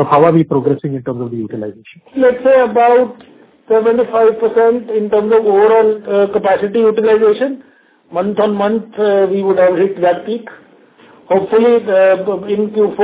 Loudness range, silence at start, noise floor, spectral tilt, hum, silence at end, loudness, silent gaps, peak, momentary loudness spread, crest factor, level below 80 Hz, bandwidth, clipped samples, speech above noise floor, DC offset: 3 LU; 0 s; -44 dBFS; -11 dB/octave; none; 0 s; -13 LUFS; none; 0 dBFS; 11 LU; 12 dB; -56 dBFS; 4 kHz; under 0.1%; 32 dB; under 0.1%